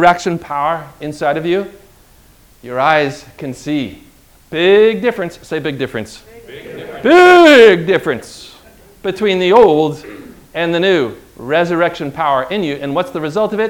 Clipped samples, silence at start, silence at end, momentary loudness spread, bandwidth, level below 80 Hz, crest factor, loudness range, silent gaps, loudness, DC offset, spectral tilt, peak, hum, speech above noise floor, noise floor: 1%; 0 s; 0 s; 21 LU; 17 kHz; -48 dBFS; 14 dB; 8 LU; none; -13 LUFS; under 0.1%; -5.5 dB/octave; 0 dBFS; none; 33 dB; -46 dBFS